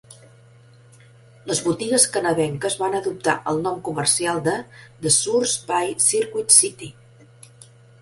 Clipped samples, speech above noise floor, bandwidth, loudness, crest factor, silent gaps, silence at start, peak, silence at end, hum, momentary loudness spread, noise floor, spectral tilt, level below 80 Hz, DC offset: under 0.1%; 28 dB; 12 kHz; -19 LUFS; 22 dB; none; 0.1 s; 0 dBFS; 1.1 s; none; 12 LU; -50 dBFS; -2.5 dB/octave; -60 dBFS; under 0.1%